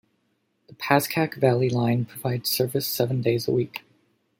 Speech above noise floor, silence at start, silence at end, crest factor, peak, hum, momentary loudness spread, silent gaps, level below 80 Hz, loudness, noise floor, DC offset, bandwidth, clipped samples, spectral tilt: 48 dB; 0.7 s; 0.6 s; 22 dB; -4 dBFS; none; 7 LU; none; -64 dBFS; -24 LUFS; -71 dBFS; under 0.1%; 17 kHz; under 0.1%; -5.5 dB/octave